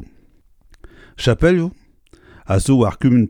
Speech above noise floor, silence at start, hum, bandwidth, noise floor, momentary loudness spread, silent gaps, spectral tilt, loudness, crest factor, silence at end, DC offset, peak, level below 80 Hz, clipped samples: 37 dB; 0 s; none; 15 kHz; -51 dBFS; 7 LU; none; -6.5 dB/octave; -17 LUFS; 18 dB; 0 s; under 0.1%; 0 dBFS; -34 dBFS; under 0.1%